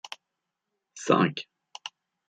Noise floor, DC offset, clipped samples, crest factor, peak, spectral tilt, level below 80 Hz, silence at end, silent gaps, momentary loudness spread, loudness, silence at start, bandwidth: -84 dBFS; under 0.1%; under 0.1%; 24 dB; -8 dBFS; -5 dB/octave; -74 dBFS; 0.4 s; none; 20 LU; -26 LUFS; 0.05 s; 10 kHz